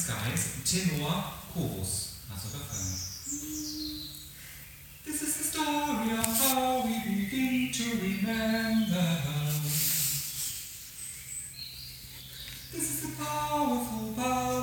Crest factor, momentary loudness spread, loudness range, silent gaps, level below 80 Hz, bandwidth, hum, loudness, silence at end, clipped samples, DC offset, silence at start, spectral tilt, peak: 26 dB; 13 LU; 7 LU; none; -54 dBFS; 19.5 kHz; none; -31 LUFS; 0 s; under 0.1%; under 0.1%; 0 s; -3.5 dB/octave; -6 dBFS